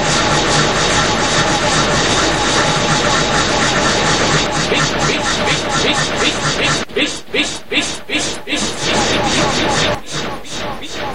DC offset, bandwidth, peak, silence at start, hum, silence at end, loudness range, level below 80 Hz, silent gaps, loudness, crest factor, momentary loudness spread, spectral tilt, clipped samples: 3%; 16 kHz; 0 dBFS; 0 s; none; 0 s; 3 LU; -34 dBFS; none; -14 LUFS; 16 dB; 6 LU; -3 dB/octave; under 0.1%